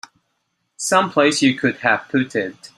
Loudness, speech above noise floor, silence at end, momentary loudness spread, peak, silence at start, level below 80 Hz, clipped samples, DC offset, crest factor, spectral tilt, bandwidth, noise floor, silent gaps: -18 LUFS; 53 dB; 0.1 s; 9 LU; -2 dBFS; 0.8 s; -64 dBFS; under 0.1%; under 0.1%; 18 dB; -3.5 dB/octave; 13.5 kHz; -71 dBFS; none